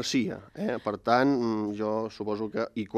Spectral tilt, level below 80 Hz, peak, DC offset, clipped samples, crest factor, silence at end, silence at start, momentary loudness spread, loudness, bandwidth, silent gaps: -5 dB/octave; -66 dBFS; -8 dBFS; under 0.1%; under 0.1%; 22 dB; 0 s; 0 s; 9 LU; -29 LUFS; 14 kHz; none